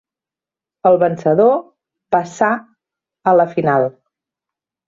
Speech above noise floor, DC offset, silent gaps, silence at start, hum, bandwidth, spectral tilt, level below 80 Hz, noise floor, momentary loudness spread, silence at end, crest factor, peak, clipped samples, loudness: 75 dB; under 0.1%; none; 0.85 s; none; 7.6 kHz; -7.5 dB/octave; -62 dBFS; -89 dBFS; 8 LU; 1 s; 16 dB; -2 dBFS; under 0.1%; -16 LUFS